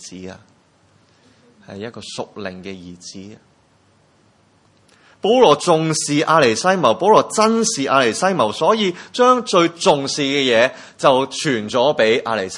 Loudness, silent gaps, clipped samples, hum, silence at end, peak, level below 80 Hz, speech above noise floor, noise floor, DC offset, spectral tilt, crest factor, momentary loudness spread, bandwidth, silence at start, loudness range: -16 LUFS; none; under 0.1%; none; 0 s; 0 dBFS; -64 dBFS; 39 dB; -56 dBFS; under 0.1%; -3.5 dB/octave; 18 dB; 20 LU; 11.5 kHz; 0 s; 19 LU